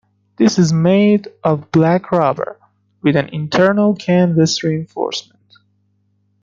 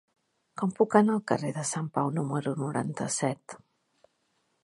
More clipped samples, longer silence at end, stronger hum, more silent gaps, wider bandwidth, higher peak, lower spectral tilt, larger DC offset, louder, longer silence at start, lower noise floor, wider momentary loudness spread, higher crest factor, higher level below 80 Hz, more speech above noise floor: neither; first, 1.2 s vs 1.05 s; first, 50 Hz at -35 dBFS vs none; neither; second, 7.6 kHz vs 11.5 kHz; first, 0 dBFS vs -6 dBFS; about the same, -6 dB/octave vs -5.5 dB/octave; neither; first, -15 LUFS vs -28 LUFS; second, 0.4 s vs 0.55 s; second, -62 dBFS vs -74 dBFS; second, 9 LU vs 15 LU; second, 16 dB vs 24 dB; first, -56 dBFS vs -74 dBFS; about the same, 47 dB vs 46 dB